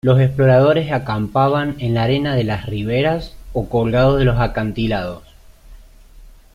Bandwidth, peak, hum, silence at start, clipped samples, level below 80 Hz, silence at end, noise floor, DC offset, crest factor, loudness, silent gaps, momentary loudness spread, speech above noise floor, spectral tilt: 7 kHz; -2 dBFS; none; 0.05 s; under 0.1%; -34 dBFS; 0.25 s; -42 dBFS; under 0.1%; 14 dB; -17 LUFS; none; 11 LU; 26 dB; -8.5 dB/octave